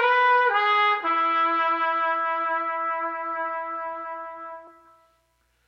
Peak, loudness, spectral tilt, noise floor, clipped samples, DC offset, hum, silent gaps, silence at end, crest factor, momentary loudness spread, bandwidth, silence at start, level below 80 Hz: -8 dBFS; -23 LUFS; -2.5 dB/octave; -68 dBFS; under 0.1%; under 0.1%; none; none; 0.95 s; 16 dB; 16 LU; 6.6 kHz; 0 s; -74 dBFS